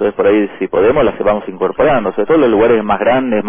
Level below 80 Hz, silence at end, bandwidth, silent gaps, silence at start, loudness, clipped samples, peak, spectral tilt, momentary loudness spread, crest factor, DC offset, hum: -40 dBFS; 0 s; 3.6 kHz; none; 0 s; -13 LUFS; under 0.1%; -2 dBFS; -10 dB/octave; 5 LU; 10 dB; under 0.1%; none